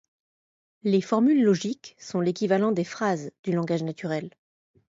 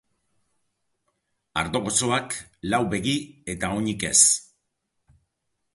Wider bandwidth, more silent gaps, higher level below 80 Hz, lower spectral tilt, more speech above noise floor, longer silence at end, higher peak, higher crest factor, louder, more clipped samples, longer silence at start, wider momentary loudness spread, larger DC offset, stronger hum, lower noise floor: second, 7.8 kHz vs 12 kHz; first, 3.39-3.44 s vs none; second, -72 dBFS vs -52 dBFS; first, -6.5 dB/octave vs -2.5 dB/octave; first, over 65 dB vs 53 dB; second, 0.65 s vs 1.35 s; second, -10 dBFS vs -2 dBFS; second, 16 dB vs 26 dB; second, -25 LUFS vs -22 LUFS; neither; second, 0.85 s vs 1.55 s; second, 11 LU vs 15 LU; neither; neither; first, under -90 dBFS vs -77 dBFS